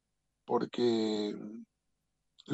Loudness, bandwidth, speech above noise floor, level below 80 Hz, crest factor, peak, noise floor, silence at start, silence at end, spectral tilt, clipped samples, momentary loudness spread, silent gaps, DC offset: -33 LUFS; 8.2 kHz; 50 dB; -80 dBFS; 16 dB; -18 dBFS; -82 dBFS; 0.5 s; 0 s; -6 dB/octave; under 0.1%; 16 LU; none; under 0.1%